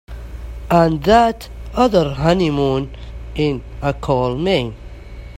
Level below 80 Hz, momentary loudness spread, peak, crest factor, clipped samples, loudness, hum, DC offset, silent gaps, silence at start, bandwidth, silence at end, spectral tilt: -32 dBFS; 20 LU; 0 dBFS; 18 dB; under 0.1%; -17 LUFS; none; under 0.1%; none; 0.1 s; 16 kHz; 0 s; -7 dB/octave